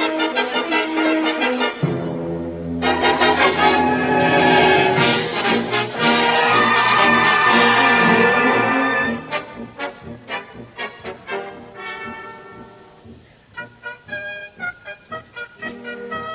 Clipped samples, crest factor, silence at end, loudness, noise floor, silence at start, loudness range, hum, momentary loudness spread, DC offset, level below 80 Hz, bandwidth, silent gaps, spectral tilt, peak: under 0.1%; 18 dB; 0 s; -16 LUFS; -45 dBFS; 0 s; 18 LU; none; 21 LU; under 0.1%; -48 dBFS; 4 kHz; none; -8.5 dB/octave; -2 dBFS